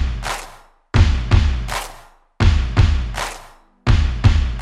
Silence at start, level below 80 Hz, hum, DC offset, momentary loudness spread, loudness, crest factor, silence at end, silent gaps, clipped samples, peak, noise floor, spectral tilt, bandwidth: 0 s; -20 dBFS; none; under 0.1%; 12 LU; -19 LUFS; 16 dB; 0 s; none; under 0.1%; -2 dBFS; -43 dBFS; -5.5 dB/octave; 13.5 kHz